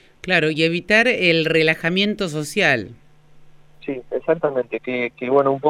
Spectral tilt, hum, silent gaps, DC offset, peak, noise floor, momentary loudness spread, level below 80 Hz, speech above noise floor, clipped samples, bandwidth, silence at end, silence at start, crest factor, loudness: -5 dB/octave; none; none; under 0.1%; -2 dBFS; -46 dBFS; 11 LU; -54 dBFS; 27 dB; under 0.1%; 15 kHz; 0 s; 0.25 s; 18 dB; -19 LUFS